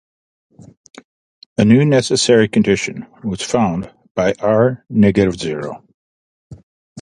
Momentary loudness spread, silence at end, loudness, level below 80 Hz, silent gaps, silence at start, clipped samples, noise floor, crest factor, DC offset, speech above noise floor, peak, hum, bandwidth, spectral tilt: 14 LU; 0 s; -16 LUFS; -46 dBFS; 4.11-4.15 s, 5.94-6.50 s, 6.63-6.96 s; 1.6 s; under 0.1%; under -90 dBFS; 16 dB; under 0.1%; over 75 dB; 0 dBFS; none; 11.5 kHz; -5.5 dB/octave